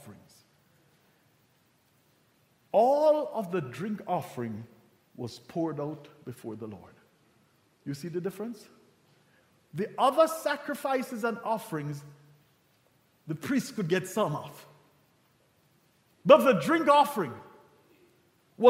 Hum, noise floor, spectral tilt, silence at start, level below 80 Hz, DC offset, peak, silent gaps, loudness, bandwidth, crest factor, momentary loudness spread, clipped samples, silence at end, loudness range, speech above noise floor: none; -67 dBFS; -5.5 dB/octave; 0.05 s; -78 dBFS; under 0.1%; -6 dBFS; none; -28 LUFS; 16 kHz; 26 dB; 20 LU; under 0.1%; 0 s; 14 LU; 39 dB